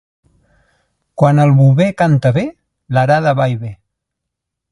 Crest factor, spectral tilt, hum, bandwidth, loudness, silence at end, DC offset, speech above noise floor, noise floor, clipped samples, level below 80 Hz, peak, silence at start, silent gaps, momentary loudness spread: 14 dB; -8.5 dB/octave; none; 10.5 kHz; -13 LUFS; 0.95 s; under 0.1%; 67 dB; -78 dBFS; under 0.1%; -50 dBFS; 0 dBFS; 1.2 s; none; 15 LU